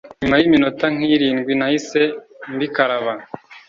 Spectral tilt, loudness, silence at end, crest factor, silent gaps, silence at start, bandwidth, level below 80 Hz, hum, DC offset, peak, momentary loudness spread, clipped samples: -5.5 dB/octave; -18 LUFS; 0.1 s; 18 dB; none; 0.05 s; 7.6 kHz; -50 dBFS; none; under 0.1%; 0 dBFS; 14 LU; under 0.1%